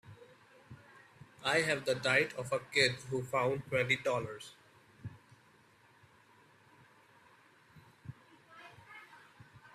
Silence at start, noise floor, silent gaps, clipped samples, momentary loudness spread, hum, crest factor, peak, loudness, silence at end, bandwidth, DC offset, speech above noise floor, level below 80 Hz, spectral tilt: 0.05 s; -65 dBFS; none; under 0.1%; 26 LU; none; 24 dB; -14 dBFS; -32 LUFS; 0.05 s; 14.5 kHz; under 0.1%; 31 dB; -74 dBFS; -4 dB/octave